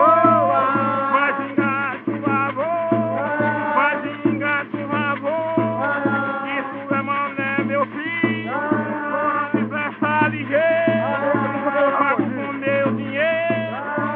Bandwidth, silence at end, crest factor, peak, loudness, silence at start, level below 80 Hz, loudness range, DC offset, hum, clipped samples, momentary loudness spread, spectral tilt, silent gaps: 4.5 kHz; 0 s; 18 dB; -2 dBFS; -20 LUFS; 0 s; -70 dBFS; 2 LU; under 0.1%; none; under 0.1%; 6 LU; -4.5 dB/octave; none